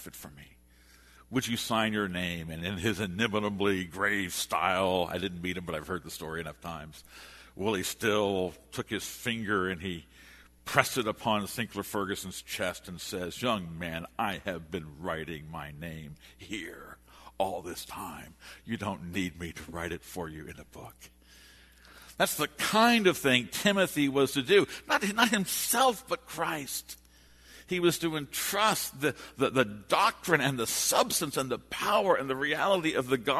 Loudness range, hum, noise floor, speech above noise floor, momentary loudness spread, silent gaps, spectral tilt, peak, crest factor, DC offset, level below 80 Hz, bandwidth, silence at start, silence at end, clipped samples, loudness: 12 LU; none; -59 dBFS; 28 dB; 16 LU; none; -3.5 dB/octave; -2 dBFS; 28 dB; under 0.1%; -58 dBFS; 13.5 kHz; 0 s; 0 s; under 0.1%; -30 LUFS